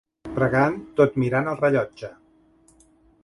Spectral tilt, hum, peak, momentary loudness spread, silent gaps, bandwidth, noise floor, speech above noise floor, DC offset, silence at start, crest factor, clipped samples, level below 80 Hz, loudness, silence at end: -8.5 dB/octave; none; -4 dBFS; 13 LU; none; 11.5 kHz; -58 dBFS; 36 dB; under 0.1%; 0.25 s; 20 dB; under 0.1%; -54 dBFS; -22 LUFS; 1.1 s